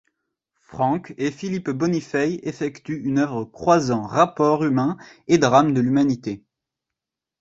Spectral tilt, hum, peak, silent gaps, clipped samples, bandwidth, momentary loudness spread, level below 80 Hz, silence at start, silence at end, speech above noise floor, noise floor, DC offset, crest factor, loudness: -6.5 dB/octave; none; -2 dBFS; none; under 0.1%; 7.8 kHz; 11 LU; -58 dBFS; 0.7 s; 1.05 s; 65 dB; -86 dBFS; under 0.1%; 20 dB; -21 LUFS